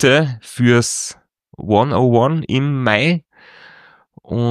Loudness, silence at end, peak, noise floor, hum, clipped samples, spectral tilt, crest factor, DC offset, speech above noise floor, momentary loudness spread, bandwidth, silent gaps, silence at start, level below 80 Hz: -16 LUFS; 0 s; 0 dBFS; -47 dBFS; none; under 0.1%; -5 dB/octave; 16 dB; under 0.1%; 32 dB; 9 LU; 14 kHz; none; 0 s; -52 dBFS